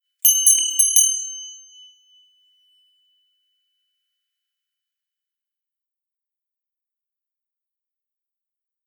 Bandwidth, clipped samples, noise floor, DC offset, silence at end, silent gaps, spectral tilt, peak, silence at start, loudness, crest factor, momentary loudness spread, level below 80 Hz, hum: over 20 kHz; under 0.1%; -87 dBFS; under 0.1%; 7.3 s; none; 12 dB/octave; 0 dBFS; 0.25 s; -14 LUFS; 26 dB; 19 LU; under -90 dBFS; none